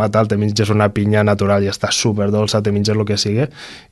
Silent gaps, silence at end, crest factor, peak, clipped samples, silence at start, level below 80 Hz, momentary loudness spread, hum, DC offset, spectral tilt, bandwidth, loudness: none; 0.1 s; 16 dB; 0 dBFS; under 0.1%; 0 s; -40 dBFS; 3 LU; none; under 0.1%; -5.5 dB/octave; 12.5 kHz; -16 LUFS